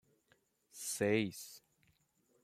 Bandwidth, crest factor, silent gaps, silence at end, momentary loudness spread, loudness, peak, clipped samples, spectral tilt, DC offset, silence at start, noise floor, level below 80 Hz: 16 kHz; 22 dB; none; 0.85 s; 19 LU; -37 LUFS; -20 dBFS; under 0.1%; -4 dB/octave; under 0.1%; 0.75 s; -76 dBFS; -80 dBFS